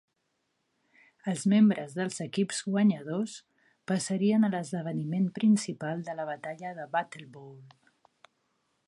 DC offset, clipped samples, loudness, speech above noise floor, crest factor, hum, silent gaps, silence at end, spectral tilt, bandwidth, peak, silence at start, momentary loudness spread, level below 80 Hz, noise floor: under 0.1%; under 0.1%; -29 LUFS; 50 dB; 18 dB; none; none; 1.2 s; -6 dB/octave; 11.5 kHz; -14 dBFS; 1.25 s; 14 LU; -80 dBFS; -78 dBFS